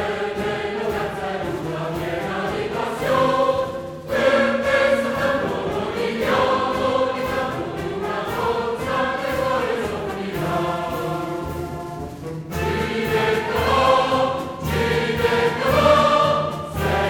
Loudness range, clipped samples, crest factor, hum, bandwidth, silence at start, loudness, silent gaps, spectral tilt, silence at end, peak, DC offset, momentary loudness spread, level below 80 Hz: 6 LU; under 0.1%; 18 dB; none; 19 kHz; 0 s; -21 LUFS; none; -5.5 dB/octave; 0 s; -2 dBFS; under 0.1%; 9 LU; -42 dBFS